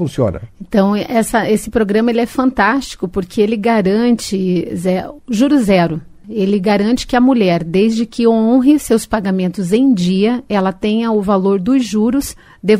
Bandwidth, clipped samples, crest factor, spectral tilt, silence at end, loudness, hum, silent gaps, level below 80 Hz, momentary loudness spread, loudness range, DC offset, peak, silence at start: 16 kHz; under 0.1%; 14 dB; -6 dB/octave; 0 s; -14 LUFS; none; none; -40 dBFS; 7 LU; 2 LU; under 0.1%; 0 dBFS; 0 s